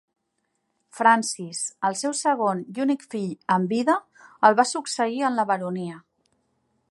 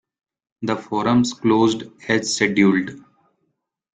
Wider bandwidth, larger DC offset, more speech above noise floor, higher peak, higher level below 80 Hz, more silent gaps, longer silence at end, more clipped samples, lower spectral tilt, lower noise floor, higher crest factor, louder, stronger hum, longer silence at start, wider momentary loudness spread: first, 11.5 kHz vs 9.4 kHz; neither; about the same, 53 dB vs 54 dB; about the same, -2 dBFS vs -2 dBFS; second, -78 dBFS vs -58 dBFS; neither; about the same, 0.9 s vs 0.95 s; neither; about the same, -4 dB/octave vs -4.5 dB/octave; about the same, -76 dBFS vs -73 dBFS; about the same, 22 dB vs 18 dB; second, -23 LUFS vs -19 LUFS; neither; first, 0.95 s vs 0.6 s; about the same, 11 LU vs 11 LU